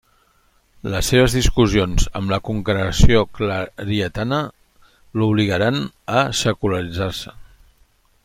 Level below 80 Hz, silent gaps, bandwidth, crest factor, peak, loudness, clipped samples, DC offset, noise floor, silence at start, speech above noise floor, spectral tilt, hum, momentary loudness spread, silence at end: -28 dBFS; none; 16 kHz; 18 dB; 0 dBFS; -19 LUFS; under 0.1%; under 0.1%; -59 dBFS; 0.85 s; 41 dB; -5 dB/octave; none; 10 LU; 0.8 s